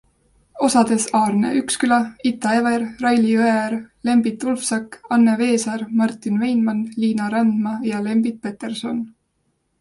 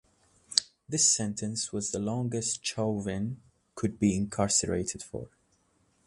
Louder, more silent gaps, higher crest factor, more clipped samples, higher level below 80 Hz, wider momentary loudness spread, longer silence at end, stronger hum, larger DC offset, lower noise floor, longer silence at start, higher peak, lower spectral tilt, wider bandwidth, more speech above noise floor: first, -19 LUFS vs -29 LUFS; neither; second, 16 dB vs 32 dB; neither; about the same, -60 dBFS vs -56 dBFS; second, 9 LU vs 15 LU; about the same, 0.7 s vs 0.8 s; neither; neither; about the same, -69 dBFS vs -70 dBFS; about the same, 0.55 s vs 0.5 s; about the same, -2 dBFS vs 0 dBFS; about the same, -4.5 dB/octave vs -3.5 dB/octave; about the same, 11.5 kHz vs 11.5 kHz; first, 50 dB vs 39 dB